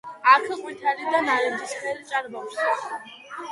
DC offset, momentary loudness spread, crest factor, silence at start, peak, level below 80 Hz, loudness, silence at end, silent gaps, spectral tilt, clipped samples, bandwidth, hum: under 0.1%; 17 LU; 22 dB; 0.05 s; -2 dBFS; -78 dBFS; -23 LUFS; 0 s; none; -2 dB/octave; under 0.1%; 11.5 kHz; none